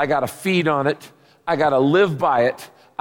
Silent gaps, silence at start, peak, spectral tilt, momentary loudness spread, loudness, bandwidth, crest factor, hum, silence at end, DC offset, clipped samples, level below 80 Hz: none; 0 s; -6 dBFS; -6 dB/octave; 16 LU; -19 LUFS; 17 kHz; 14 dB; none; 0.35 s; under 0.1%; under 0.1%; -62 dBFS